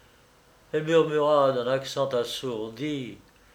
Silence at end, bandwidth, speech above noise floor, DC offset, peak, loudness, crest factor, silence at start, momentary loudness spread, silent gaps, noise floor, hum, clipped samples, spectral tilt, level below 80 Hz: 0.35 s; 16 kHz; 32 dB; under 0.1%; -10 dBFS; -26 LUFS; 18 dB; 0.75 s; 11 LU; none; -58 dBFS; none; under 0.1%; -5 dB/octave; -64 dBFS